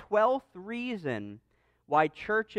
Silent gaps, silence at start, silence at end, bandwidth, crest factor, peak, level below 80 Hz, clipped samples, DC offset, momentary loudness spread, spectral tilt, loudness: none; 0 s; 0 s; 9.4 kHz; 18 dB; -12 dBFS; -68 dBFS; under 0.1%; under 0.1%; 12 LU; -6.5 dB/octave; -30 LUFS